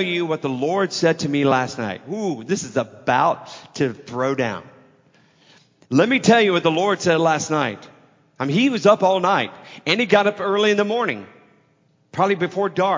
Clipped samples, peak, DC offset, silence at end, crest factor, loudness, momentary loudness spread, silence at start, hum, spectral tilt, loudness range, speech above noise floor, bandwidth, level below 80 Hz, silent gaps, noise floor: under 0.1%; -2 dBFS; under 0.1%; 0 s; 20 dB; -20 LUFS; 11 LU; 0 s; none; -5 dB/octave; 5 LU; 41 dB; 7.6 kHz; -64 dBFS; none; -61 dBFS